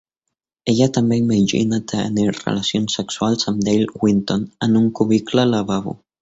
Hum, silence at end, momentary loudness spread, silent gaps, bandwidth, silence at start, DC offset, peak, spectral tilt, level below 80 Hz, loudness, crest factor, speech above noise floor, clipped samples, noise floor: none; 0.25 s; 6 LU; none; 8 kHz; 0.65 s; under 0.1%; -2 dBFS; -5.5 dB/octave; -52 dBFS; -18 LUFS; 16 dB; 62 dB; under 0.1%; -80 dBFS